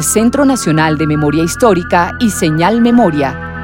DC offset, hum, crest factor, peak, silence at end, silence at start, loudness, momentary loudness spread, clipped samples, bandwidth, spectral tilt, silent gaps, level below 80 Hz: under 0.1%; none; 12 dB; 0 dBFS; 0 s; 0 s; -11 LUFS; 4 LU; under 0.1%; 16.5 kHz; -5 dB/octave; none; -34 dBFS